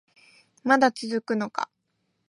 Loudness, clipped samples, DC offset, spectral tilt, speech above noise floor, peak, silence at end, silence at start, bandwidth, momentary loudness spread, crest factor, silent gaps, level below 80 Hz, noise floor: -25 LUFS; under 0.1%; under 0.1%; -4.5 dB/octave; 51 dB; -8 dBFS; 0.65 s; 0.65 s; 11.5 kHz; 13 LU; 20 dB; none; -78 dBFS; -75 dBFS